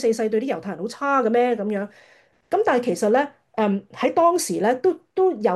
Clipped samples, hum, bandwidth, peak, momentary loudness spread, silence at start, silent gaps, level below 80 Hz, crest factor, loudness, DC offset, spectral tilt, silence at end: under 0.1%; none; 12.5 kHz; -6 dBFS; 9 LU; 0 s; none; -72 dBFS; 14 dB; -22 LUFS; under 0.1%; -5 dB/octave; 0 s